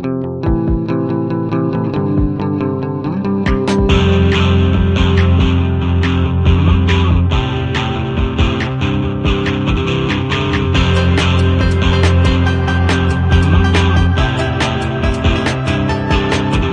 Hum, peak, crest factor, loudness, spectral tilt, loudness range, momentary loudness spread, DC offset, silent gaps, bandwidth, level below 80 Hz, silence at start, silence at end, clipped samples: none; 0 dBFS; 12 dB; -14 LUFS; -7 dB/octave; 3 LU; 5 LU; under 0.1%; none; 9.4 kHz; -22 dBFS; 0 s; 0 s; under 0.1%